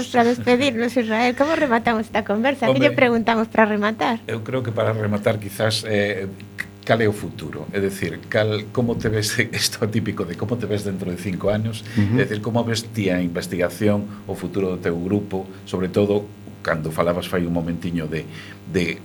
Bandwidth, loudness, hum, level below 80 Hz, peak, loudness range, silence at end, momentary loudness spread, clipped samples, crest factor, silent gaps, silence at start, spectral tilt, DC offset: 19 kHz; -21 LUFS; none; -50 dBFS; -2 dBFS; 5 LU; 0 s; 10 LU; under 0.1%; 20 dB; none; 0 s; -5.5 dB/octave; under 0.1%